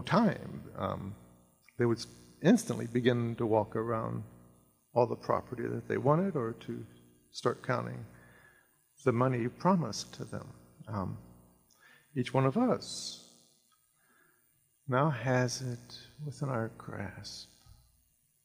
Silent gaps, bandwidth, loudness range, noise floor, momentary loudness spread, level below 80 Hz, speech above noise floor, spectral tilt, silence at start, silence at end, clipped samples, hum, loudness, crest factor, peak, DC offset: none; 15.5 kHz; 4 LU; -71 dBFS; 18 LU; -68 dBFS; 40 dB; -6.5 dB/octave; 0 s; 1 s; under 0.1%; none; -33 LUFS; 24 dB; -10 dBFS; under 0.1%